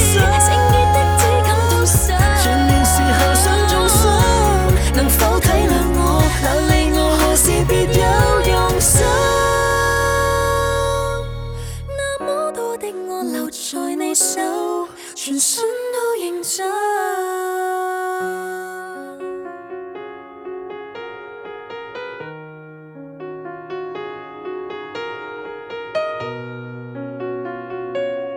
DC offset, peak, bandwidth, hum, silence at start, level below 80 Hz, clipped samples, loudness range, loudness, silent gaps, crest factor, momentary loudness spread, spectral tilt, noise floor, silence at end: under 0.1%; 0 dBFS; over 20 kHz; none; 0 s; -24 dBFS; under 0.1%; 18 LU; -16 LUFS; none; 16 dB; 19 LU; -4 dB/octave; -38 dBFS; 0 s